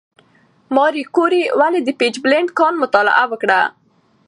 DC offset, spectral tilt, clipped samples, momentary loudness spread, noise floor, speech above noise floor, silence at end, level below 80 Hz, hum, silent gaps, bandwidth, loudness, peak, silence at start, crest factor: under 0.1%; -3.5 dB/octave; under 0.1%; 3 LU; -54 dBFS; 39 dB; 0.6 s; -68 dBFS; none; none; 10.5 kHz; -15 LUFS; 0 dBFS; 0.7 s; 16 dB